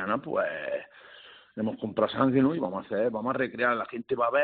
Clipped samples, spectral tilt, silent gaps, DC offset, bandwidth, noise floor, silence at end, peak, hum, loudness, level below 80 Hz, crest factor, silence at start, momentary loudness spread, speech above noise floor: under 0.1%; -4.5 dB/octave; none; under 0.1%; 4.6 kHz; -52 dBFS; 0 s; -10 dBFS; none; -28 LUFS; -68 dBFS; 18 dB; 0 s; 13 LU; 24 dB